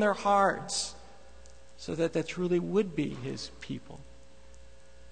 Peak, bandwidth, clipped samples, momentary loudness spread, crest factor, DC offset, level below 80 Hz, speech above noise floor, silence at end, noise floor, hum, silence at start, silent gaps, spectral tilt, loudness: -12 dBFS; 9.4 kHz; under 0.1%; 18 LU; 20 dB; 0.4%; -56 dBFS; 25 dB; 0.5 s; -55 dBFS; none; 0 s; none; -4.5 dB/octave; -31 LUFS